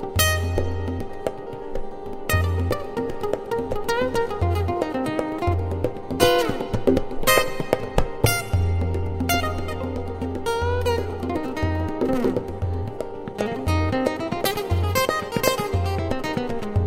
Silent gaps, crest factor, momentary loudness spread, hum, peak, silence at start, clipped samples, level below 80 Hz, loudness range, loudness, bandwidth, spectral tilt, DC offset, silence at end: none; 22 dB; 9 LU; none; 0 dBFS; 0 s; under 0.1%; -34 dBFS; 4 LU; -24 LUFS; 16 kHz; -5 dB/octave; under 0.1%; 0 s